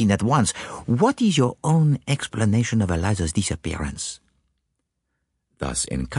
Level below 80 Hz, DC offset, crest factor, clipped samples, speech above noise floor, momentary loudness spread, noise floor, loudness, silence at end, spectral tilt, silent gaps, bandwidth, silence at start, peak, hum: -42 dBFS; under 0.1%; 18 dB; under 0.1%; 55 dB; 11 LU; -77 dBFS; -22 LUFS; 0 s; -5.5 dB/octave; none; 11.5 kHz; 0 s; -4 dBFS; none